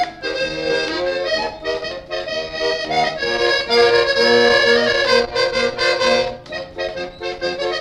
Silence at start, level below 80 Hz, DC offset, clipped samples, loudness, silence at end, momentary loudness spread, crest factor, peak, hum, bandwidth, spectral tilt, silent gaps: 0 s; -46 dBFS; under 0.1%; under 0.1%; -17 LUFS; 0 s; 13 LU; 16 dB; -2 dBFS; none; 11.5 kHz; -3 dB/octave; none